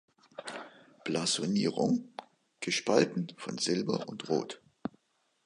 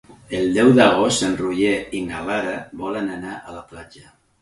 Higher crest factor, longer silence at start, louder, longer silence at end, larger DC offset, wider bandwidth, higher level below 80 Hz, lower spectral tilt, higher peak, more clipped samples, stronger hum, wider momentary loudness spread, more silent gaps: about the same, 24 dB vs 20 dB; first, 0.4 s vs 0.1 s; second, -32 LUFS vs -19 LUFS; first, 0.55 s vs 0.4 s; neither; about the same, 11.5 kHz vs 11.5 kHz; second, -76 dBFS vs -50 dBFS; about the same, -4 dB/octave vs -4.5 dB/octave; second, -10 dBFS vs -2 dBFS; neither; neither; about the same, 18 LU vs 20 LU; neither